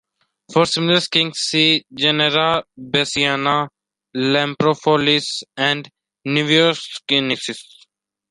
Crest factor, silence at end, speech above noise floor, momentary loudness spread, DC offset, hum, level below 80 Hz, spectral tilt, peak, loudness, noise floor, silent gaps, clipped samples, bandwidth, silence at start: 18 dB; 0.7 s; 39 dB; 10 LU; under 0.1%; none; -60 dBFS; -4 dB/octave; -2 dBFS; -17 LUFS; -57 dBFS; none; under 0.1%; 11.5 kHz; 0.5 s